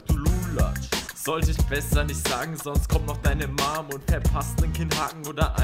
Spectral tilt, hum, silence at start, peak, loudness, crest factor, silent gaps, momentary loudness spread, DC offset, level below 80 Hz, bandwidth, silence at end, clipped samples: -5 dB/octave; none; 0 s; -8 dBFS; -26 LUFS; 16 dB; none; 4 LU; under 0.1%; -28 dBFS; 16 kHz; 0 s; under 0.1%